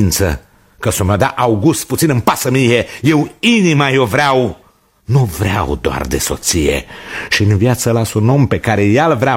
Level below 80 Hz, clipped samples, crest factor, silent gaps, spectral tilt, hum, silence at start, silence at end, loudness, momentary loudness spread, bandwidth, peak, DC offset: -32 dBFS; under 0.1%; 14 dB; none; -5 dB/octave; none; 0 s; 0 s; -13 LUFS; 7 LU; 16.5 kHz; 0 dBFS; under 0.1%